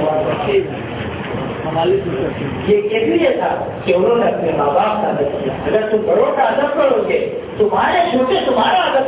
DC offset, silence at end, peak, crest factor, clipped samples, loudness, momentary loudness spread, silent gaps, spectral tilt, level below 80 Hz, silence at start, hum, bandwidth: under 0.1%; 0 s; -2 dBFS; 14 dB; under 0.1%; -16 LUFS; 8 LU; none; -10 dB/octave; -42 dBFS; 0 s; none; 4 kHz